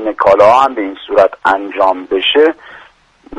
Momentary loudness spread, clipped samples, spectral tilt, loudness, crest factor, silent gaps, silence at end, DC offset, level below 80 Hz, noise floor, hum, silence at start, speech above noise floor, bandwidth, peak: 7 LU; 0.2%; -4.5 dB/octave; -11 LUFS; 12 dB; none; 0 s; under 0.1%; -50 dBFS; -44 dBFS; none; 0 s; 33 dB; 10.5 kHz; 0 dBFS